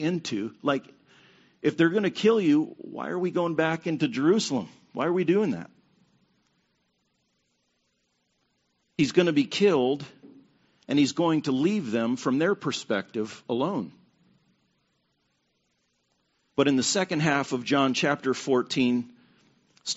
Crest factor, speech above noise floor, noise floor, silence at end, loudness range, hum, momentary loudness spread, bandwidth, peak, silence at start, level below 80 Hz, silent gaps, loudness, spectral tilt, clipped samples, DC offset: 20 dB; 49 dB; -74 dBFS; 0 s; 8 LU; none; 11 LU; 8 kHz; -8 dBFS; 0 s; -70 dBFS; none; -26 LUFS; -4.5 dB/octave; under 0.1%; under 0.1%